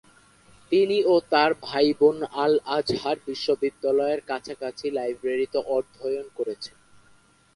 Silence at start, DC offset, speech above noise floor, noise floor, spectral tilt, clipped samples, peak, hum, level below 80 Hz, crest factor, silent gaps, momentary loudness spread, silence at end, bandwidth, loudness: 0.7 s; under 0.1%; 35 dB; -58 dBFS; -5 dB/octave; under 0.1%; -6 dBFS; 50 Hz at -60 dBFS; -64 dBFS; 20 dB; none; 11 LU; 0.9 s; 11.5 kHz; -24 LUFS